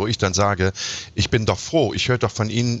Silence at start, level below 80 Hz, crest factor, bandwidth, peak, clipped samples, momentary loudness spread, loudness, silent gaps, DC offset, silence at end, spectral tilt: 0 s; -42 dBFS; 16 dB; 8.2 kHz; -6 dBFS; under 0.1%; 4 LU; -21 LUFS; none; under 0.1%; 0 s; -4.5 dB/octave